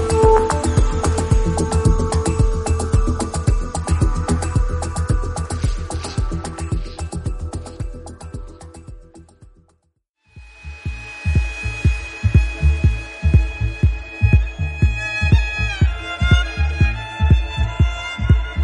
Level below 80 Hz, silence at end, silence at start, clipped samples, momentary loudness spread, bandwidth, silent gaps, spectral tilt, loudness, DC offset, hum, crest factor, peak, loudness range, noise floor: -22 dBFS; 0 s; 0 s; under 0.1%; 13 LU; 11.5 kHz; 10.09-10.14 s; -6 dB/octave; -20 LUFS; under 0.1%; none; 16 dB; -2 dBFS; 13 LU; -67 dBFS